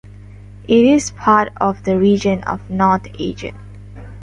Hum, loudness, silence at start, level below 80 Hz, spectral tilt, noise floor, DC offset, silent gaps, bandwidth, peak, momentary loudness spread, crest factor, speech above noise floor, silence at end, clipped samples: 50 Hz at -35 dBFS; -16 LUFS; 0.7 s; -40 dBFS; -6 dB/octave; -37 dBFS; under 0.1%; none; 11.5 kHz; -2 dBFS; 21 LU; 16 dB; 21 dB; 0 s; under 0.1%